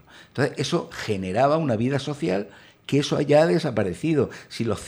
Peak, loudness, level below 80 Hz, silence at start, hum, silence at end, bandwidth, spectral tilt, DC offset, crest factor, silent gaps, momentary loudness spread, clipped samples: -6 dBFS; -23 LUFS; -56 dBFS; 0.15 s; none; 0 s; over 20 kHz; -6 dB/octave; under 0.1%; 18 dB; none; 10 LU; under 0.1%